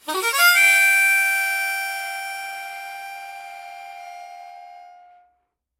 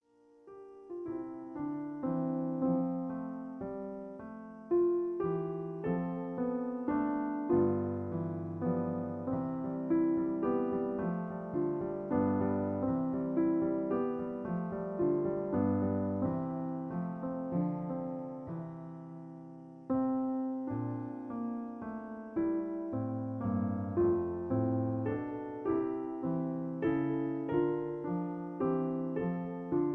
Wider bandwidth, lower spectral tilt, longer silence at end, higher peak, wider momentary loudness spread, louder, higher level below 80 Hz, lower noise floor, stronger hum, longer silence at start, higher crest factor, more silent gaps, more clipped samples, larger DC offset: first, 17 kHz vs 3.3 kHz; second, 2.5 dB/octave vs -12 dB/octave; first, 0.9 s vs 0 s; first, -2 dBFS vs -18 dBFS; first, 25 LU vs 11 LU; first, -17 LUFS vs -35 LUFS; second, -78 dBFS vs -64 dBFS; first, -71 dBFS vs -61 dBFS; neither; second, 0.05 s vs 0.45 s; about the same, 20 dB vs 16 dB; neither; neither; neither